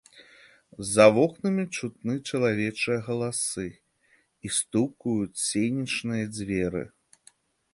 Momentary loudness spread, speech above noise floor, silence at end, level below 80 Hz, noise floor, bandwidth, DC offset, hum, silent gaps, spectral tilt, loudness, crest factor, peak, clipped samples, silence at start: 14 LU; 40 dB; 0.85 s; -58 dBFS; -66 dBFS; 11.5 kHz; under 0.1%; none; none; -4.5 dB/octave; -26 LUFS; 24 dB; -4 dBFS; under 0.1%; 0.15 s